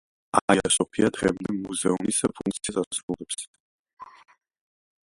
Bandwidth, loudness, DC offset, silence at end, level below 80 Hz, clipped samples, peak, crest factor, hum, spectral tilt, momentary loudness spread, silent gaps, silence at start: 11.5 kHz; -25 LUFS; under 0.1%; 1 s; -56 dBFS; under 0.1%; 0 dBFS; 26 dB; none; -3.5 dB/octave; 10 LU; 0.42-0.48 s, 2.87-2.91 s, 3.03-3.08 s, 3.47-3.54 s, 3.60-3.85 s, 3.93-3.97 s; 0.35 s